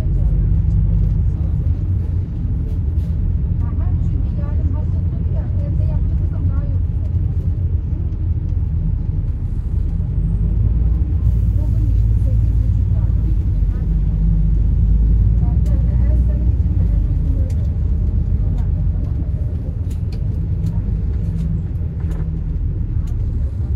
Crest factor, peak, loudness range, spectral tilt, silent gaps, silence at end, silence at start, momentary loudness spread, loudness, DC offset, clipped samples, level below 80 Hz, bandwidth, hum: 12 dB; -4 dBFS; 4 LU; -11 dB/octave; none; 0 s; 0 s; 5 LU; -19 LUFS; under 0.1%; under 0.1%; -18 dBFS; 2.5 kHz; none